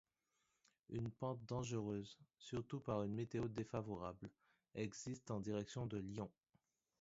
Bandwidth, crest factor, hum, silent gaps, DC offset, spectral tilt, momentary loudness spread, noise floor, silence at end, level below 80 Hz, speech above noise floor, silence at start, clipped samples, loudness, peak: 7.6 kHz; 20 dB; none; none; under 0.1%; -7 dB/octave; 9 LU; -87 dBFS; 0.7 s; -70 dBFS; 41 dB; 0.9 s; under 0.1%; -47 LUFS; -28 dBFS